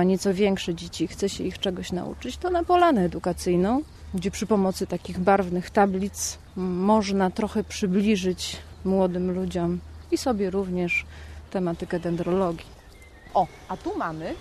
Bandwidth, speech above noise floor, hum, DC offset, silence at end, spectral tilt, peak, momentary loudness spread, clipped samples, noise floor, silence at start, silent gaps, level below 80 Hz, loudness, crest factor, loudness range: 13 kHz; 23 dB; none; under 0.1%; 0 s; -5.5 dB/octave; -8 dBFS; 9 LU; under 0.1%; -48 dBFS; 0 s; none; -46 dBFS; -25 LUFS; 18 dB; 4 LU